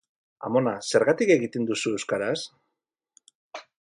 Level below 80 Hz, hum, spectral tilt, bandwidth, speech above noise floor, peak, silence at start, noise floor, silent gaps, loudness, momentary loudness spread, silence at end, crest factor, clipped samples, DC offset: -72 dBFS; none; -4.5 dB/octave; 11.5 kHz; 59 dB; -8 dBFS; 0.4 s; -83 dBFS; 3.35-3.51 s; -25 LUFS; 20 LU; 0.2 s; 20 dB; under 0.1%; under 0.1%